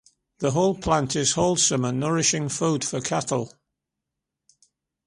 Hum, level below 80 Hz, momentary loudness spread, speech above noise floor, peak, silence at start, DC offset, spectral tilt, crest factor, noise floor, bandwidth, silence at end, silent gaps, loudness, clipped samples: none; -52 dBFS; 7 LU; 61 dB; -6 dBFS; 0.4 s; under 0.1%; -4 dB/octave; 18 dB; -84 dBFS; 11.5 kHz; 1.6 s; none; -23 LUFS; under 0.1%